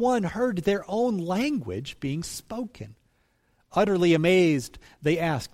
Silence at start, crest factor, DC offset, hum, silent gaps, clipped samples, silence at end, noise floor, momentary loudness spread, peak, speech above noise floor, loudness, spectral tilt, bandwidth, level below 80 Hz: 0 s; 16 dB; under 0.1%; none; none; under 0.1%; 0.05 s; -68 dBFS; 15 LU; -10 dBFS; 43 dB; -25 LUFS; -6 dB/octave; 16 kHz; -54 dBFS